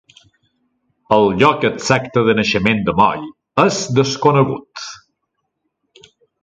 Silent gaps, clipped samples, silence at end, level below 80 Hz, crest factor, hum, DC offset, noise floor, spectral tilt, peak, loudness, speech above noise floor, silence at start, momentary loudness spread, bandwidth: none; under 0.1%; 1.45 s; -48 dBFS; 18 dB; none; under 0.1%; -73 dBFS; -5 dB/octave; 0 dBFS; -15 LUFS; 58 dB; 1.1 s; 13 LU; 9.2 kHz